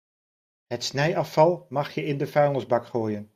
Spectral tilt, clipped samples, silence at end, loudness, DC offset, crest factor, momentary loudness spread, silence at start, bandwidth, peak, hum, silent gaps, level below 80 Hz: -6 dB/octave; under 0.1%; 0.1 s; -25 LUFS; under 0.1%; 20 dB; 8 LU; 0.7 s; 15.5 kHz; -6 dBFS; none; none; -66 dBFS